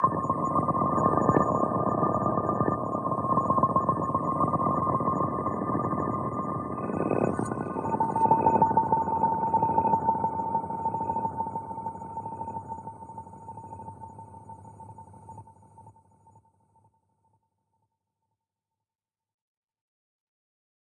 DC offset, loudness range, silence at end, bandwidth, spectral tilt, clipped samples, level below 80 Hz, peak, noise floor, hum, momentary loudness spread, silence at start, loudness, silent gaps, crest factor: under 0.1%; 17 LU; 4.95 s; 11 kHz; -10 dB/octave; under 0.1%; -60 dBFS; -8 dBFS; under -90 dBFS; none; 20 LU; 0 s; -27 LUFS; none; 20 dB